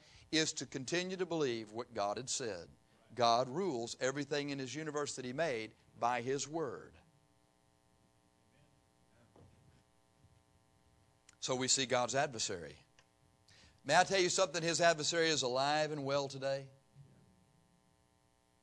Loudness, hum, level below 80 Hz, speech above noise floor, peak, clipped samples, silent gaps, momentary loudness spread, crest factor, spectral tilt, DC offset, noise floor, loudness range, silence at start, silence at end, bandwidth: -35 LUFS; none; -76 dBFS; 37 dB; -16 dBFS; under 0.1%; none; 12 LU; 24 dB; -3 dB/octave; under 0.1%; -73 dBFS; 9 LU; 0.3 s; 1.6 s; 11 kHz